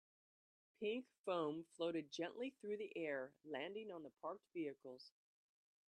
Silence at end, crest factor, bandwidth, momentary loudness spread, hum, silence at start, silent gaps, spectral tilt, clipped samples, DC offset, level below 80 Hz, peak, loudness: 0.8 s; 18 dB; 11 kHz; 9 LU; none; 0.8 s; 1.19-1.24 s; -5 dB/octave; under 0.1%; under 0.1%; under -90 dBFS; -30 dBFS; -48 LUFS